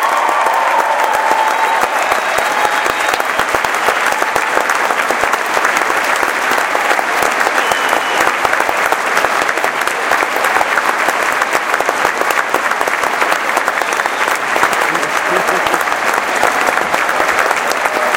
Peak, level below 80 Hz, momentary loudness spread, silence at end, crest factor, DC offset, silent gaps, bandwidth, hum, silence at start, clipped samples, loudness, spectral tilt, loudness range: 0 dBFS; -50 dBFS; 2 LU; 0 s; 14 dB; under 0.1%; none; 17.5 kHz; none; 0 s; under 0.1%; -13 LUFS; -1 dB/octave; 1 LU